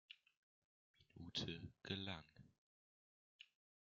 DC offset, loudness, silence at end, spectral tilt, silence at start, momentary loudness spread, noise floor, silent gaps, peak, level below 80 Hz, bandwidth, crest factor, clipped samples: under 0.1%; -50 LUFS; 0.4 s; -3 dB/octave; 0.1 s; 20 LU; under -90 dBFS; 0.37-0.94 s, 2.58-3.39 s; -30 dBFS; -80 dBFS; 7.2 kHz; 26 dB; under 0.1%